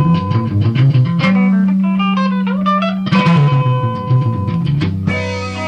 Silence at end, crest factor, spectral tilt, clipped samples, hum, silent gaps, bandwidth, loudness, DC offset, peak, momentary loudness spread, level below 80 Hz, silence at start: 0 s; 12 dB; -8 dB/octave; under 0.1%; none; none; 7.8 kHz; -14 LUFS; under 0.1%; 0 dBFS; 5 LU; -46 dBFS; 0 s